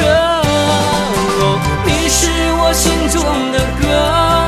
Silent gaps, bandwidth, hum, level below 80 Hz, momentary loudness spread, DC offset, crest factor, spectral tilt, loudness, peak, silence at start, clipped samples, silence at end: none; 14 kHz; none; -22 dBFS; 3 LU; under 0.1%; 12 dB; -4 dB/octave; -13 LUFS; 0 dBFS; 0 s; under 0.1%; 0 s